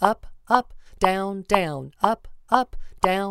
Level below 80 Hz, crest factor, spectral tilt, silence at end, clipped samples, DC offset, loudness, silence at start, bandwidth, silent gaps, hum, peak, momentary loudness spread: -42 dBFS; 22 dB; -5 dB/octave; 0 s; under 0.1%; under 0.1%; -24 LUFS; 0 s; 16 kHz; none; none; -2 dBFS; 9 LU